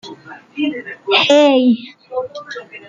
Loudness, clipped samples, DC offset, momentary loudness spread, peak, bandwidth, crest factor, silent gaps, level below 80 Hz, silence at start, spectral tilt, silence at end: -14 LUFS; under 0.1%; under 0.1%; 20 LU; 0 dBFS; 7.6 kHz; 16 dB; none; -68 dBFS; 0.05 s; -3.5 dB/octave; 0.1 s